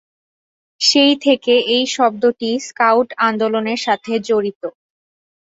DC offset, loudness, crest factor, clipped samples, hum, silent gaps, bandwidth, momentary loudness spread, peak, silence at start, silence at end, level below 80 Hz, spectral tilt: under 0.1%; -16 LUFS; 16 dB; under 0.1%; none; 4.55-4.61 s; 8.2 kHz; 9 LU; -2 dBFS; 0.8 s; 0.75 s; -64 dBFS; -3 dB/octave